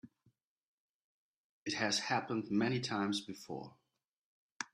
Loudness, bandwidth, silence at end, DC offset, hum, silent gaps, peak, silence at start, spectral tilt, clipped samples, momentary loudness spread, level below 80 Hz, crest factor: -37 LUFS; 14 kHz; 0.1 s; under 0.1%; none; 0.47-0.56 s, 0.65-1.66 s, 4.08-4.60 s; -18 dBFS; 0.05 s; -4 dB/octave; under 0.1%; 13 LU; -78 dBFS; 22 dB